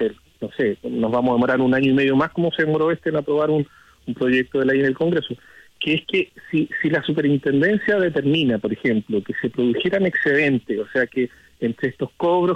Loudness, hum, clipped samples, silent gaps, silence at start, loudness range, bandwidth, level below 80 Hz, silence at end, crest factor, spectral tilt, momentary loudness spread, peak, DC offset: -20 LUFS; none; under 0.1%; none; 0 s; 2 LU; 8.4 kHz; -58 dBFS; 0 s; 12 dB; -7.5 dB/octave; 8 LU; -8 dBFS; under 0.1%